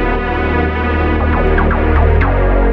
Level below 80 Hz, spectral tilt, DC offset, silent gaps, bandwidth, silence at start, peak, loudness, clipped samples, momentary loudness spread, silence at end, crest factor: -14 dBFS; -9.5 dB/octave; under 0.1%; none; 4.9 kHz; 0 s; 0 dBFS; -14 LUFS; under 0.1%; 3 LU; 0 s; 12 dB